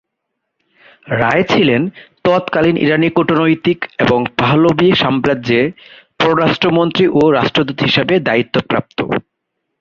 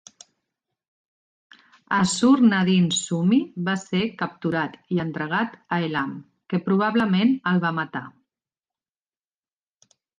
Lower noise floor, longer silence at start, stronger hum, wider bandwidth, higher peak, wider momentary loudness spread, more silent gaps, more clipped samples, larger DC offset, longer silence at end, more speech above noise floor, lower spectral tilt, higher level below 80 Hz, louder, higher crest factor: second, -74 dBFS vs under -90 dBFS; second, 1.05 s vs 1.9 s; neither; second, 7.2 kHz vs 9.8 kHz; first, 0 dBFS vs -6 dBFS; second, 7 LU vs 10 LU; neither; neither; neither; second, 0.6 s vs 2.1 s; second, 61 dB vs over 68 dB; first, -7 dB/octave vs -5 dB/octave; first, -48 dBFS vs -64 dBFS; first, -14 LUFS vs -22 LUFS; about the same, 14 dB vs 18 dB